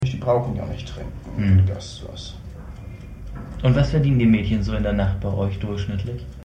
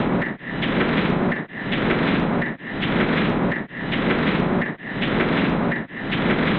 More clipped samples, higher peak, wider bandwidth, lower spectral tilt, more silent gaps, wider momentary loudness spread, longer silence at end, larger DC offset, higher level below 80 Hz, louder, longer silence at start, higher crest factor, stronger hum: neither; about the same, -6 dBFS vs -6 dBFS; first, 8.6 kHz vs 5 kHz; about the same, -8 dB/octave vs -9 dB/octave; neither; first, 20 LU vs 6 LU; about the same, 0 s vs 0 s; neither; first, -34 dBFS vs -42 dBFS; about the same, -22 LUFS vs -22 LUFS; about the same, 0 s vs 0 s; about the same, 16 dB vs 16 dB; neither